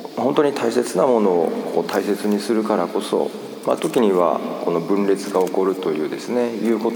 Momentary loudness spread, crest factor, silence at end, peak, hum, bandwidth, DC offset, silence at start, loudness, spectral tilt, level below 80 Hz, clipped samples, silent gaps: 6 LU; 16 dB; 0 s; -4 dBFS; none; over 20 kHz; under 0.1%; 0 s; -20 LUFS; -5.5 dB/octave; -74 dBFS; under 0.1%; none